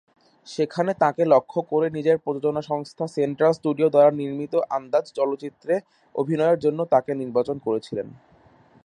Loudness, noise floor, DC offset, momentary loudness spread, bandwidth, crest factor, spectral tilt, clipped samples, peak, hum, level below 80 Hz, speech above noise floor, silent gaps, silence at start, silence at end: -23 LUFS; -55 dBFS; under 0.1%; 10 LU; 10.5 kHz; 20 dB; -7.5 dB/octave; under 0.1%; -4 dBFS; none; -68 dBFS; 32 dB; none; 0.45 s; 0.75 s